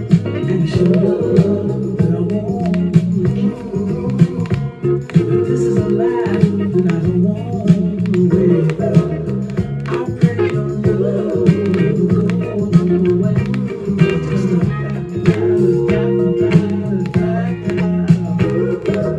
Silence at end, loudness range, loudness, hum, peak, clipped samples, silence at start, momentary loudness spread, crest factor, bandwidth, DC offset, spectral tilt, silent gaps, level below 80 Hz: 0 s; 2 LU; -16 LUFS; none; 0 dBFS; under 0.1%; 0 s; 6 LU; 14 dB; 8.2 kHz; under 0.1%; -9 dB/octave; none; -40 dBFS